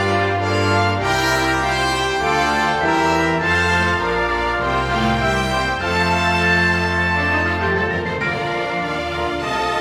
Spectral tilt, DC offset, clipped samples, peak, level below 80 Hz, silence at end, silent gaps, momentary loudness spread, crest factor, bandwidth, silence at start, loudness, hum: -4.5 dB/octave; under 0.1%; under 0.1%; -4 dBFS; -36 dBFS; 0 s; none; 5 LU; 14 dB; 17 kHz; 0 s; -18 LUFS; none